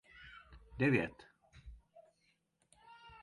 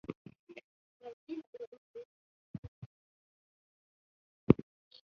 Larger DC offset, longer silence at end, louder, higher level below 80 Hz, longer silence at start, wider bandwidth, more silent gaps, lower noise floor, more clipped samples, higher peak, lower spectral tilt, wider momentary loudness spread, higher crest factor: neither; second, 0.1 s vs 0.5 s; about the same, -35 LUFS vs -33 LUFS; about the same, -62 dBFS vs -60 dBFS; about the same, 0.2 s vs 0.1 s; first, 11 kHz vs 6.2 kHz; second, none vs 0.16-0.25 s, 0.39-0.47 s, 0.64-1.00 s, 1.13-1.27 s, 1.47-1.53 s, 1.67-1.72 s, 1.78-1.94 s, 2.05-4.47 s; second, -78 dBFS vs under -90 dBFS; neither; second, -18 dBFS vs -6 dBFS; about the same, -8 dB/octave vs -9 dB/octave; about the same, 26 LU vs 26 LU; second, 22 dB vs 34 dB